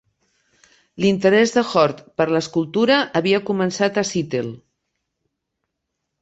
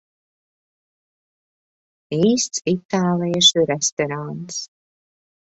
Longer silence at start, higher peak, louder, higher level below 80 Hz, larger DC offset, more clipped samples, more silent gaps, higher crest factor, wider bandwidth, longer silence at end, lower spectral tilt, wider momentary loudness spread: second, 0.95 s vs 2.1 s; about the same, -2 dBFS vs -2 dBFS; about the same, -19 LUFS vs -19 LUFS; about the same, -60 dBFS vs -64 dBFS; neither; neither; second, none vs 2.85-2.89 s, 3.92-3.97 s; about the same, 18 dB vs 22 dB; about the same, 8.2 kHz vs 8.2 kHz; first, 1.65 s vs 0.85 s; first, -5 dB/octave vs -3.5 dB/octave; second, 8 LU vs 15 LU